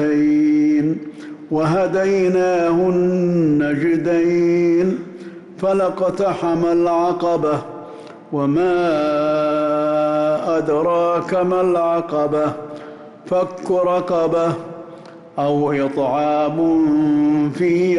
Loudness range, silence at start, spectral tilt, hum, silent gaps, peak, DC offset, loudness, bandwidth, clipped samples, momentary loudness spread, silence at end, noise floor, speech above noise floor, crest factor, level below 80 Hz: 3 LU; 0 s; -8 dB/octave; none; none; -10 dBFS; under 0.1%; -18 LUFS; 11 kHz; under 0.1%; 14 LU; 0 s; -38 dBFS; 21 dB; 8 dB; -56 dBFS